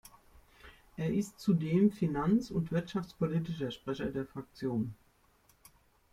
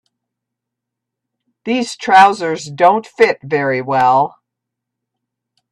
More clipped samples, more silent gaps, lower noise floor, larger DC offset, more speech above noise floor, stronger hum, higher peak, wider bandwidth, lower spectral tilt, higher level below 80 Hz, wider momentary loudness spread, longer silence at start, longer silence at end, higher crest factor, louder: neither; neither; second, -67 dBFS vs -81 dBFS; neither; second, 35 dB vs 67 dB; neither; second, -16 dBFS vs 0 dBFS; first, 15 kHz vs 12 kHz; first, -7.5 dB/octave vs -4.5 dB/octave; about the same, -60 dBFS vs -62 dBFS; about the same, 11 LU vs 11 LU; second, 0.65 s vs 1.65 s; second, 1.2 s vs 1.45 s; about the same, 18 dB vs 16 dB; second, -33 LUFS vs -14 LUFS